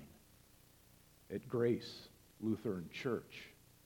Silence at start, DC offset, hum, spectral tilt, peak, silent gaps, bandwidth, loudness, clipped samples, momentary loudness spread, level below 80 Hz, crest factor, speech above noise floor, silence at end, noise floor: 0 s; under 0.1%; none; -6.5 dB/octave; -24 dBFS; none; 19 kHz; -41 LUFS; under 0.1%; 20 LU; -72 dBFS; 18 dB; 26 dB; 0.35 s; -66 dBFS